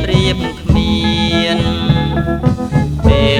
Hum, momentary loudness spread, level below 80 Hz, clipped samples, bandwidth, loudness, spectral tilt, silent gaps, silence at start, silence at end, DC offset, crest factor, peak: none; 3 LU; -22 dBFS; under 0.1%; 13 kHz; -14 LUFS; -6.5 dB/octave; none; 0 s; 0 s; under 0.1%; 12 dB; 0 dBFS